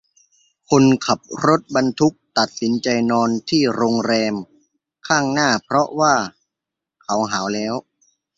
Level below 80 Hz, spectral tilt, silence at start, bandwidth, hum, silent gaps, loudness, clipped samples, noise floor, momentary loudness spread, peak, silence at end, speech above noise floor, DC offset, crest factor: -58 dBFS; -4.5 dB/octave; 0.7 s; 7.8 kHz; none; none; -18 LUFS; under 0.1%; -84 dBFS; 8 LU; 0 dBFS; 0.6 s; 67 dB; under 0.1%; 18 dB